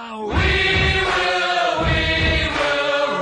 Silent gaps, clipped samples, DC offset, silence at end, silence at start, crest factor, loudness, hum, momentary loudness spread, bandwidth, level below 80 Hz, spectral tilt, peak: none; under 0.1%; under 0.1%; 0 s; 0 s; 12 dB; -18 LUFS; none; 3 LU; 10.5 kHz; -30 dBFS; -4.5 dB/octave; -6 dBFS